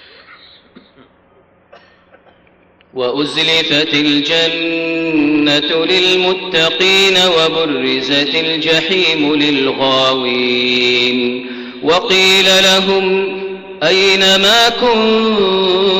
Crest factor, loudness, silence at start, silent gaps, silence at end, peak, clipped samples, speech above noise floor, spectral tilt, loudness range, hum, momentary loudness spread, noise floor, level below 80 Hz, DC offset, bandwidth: 12 dB; -11 LUFS; 0.3 s; none; 0 s; -2 dBFS; under 0.1%; 37 dB; -3 dB/octave; 5 LU; none; 9 LU; -50 dBFS; -50 dBFS; under 0.1%; 16 kHz